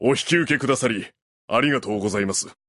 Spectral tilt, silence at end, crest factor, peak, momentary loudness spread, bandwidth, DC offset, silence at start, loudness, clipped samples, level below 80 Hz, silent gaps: -4 dB/octave; 0.15 s; 16 dB; -6 dBFS; 5 LU; 11.5 kHz; under 0.1%; 0 s; -22 LUFS; under 0.1%; -56 dBFS; 1.22-1.48 s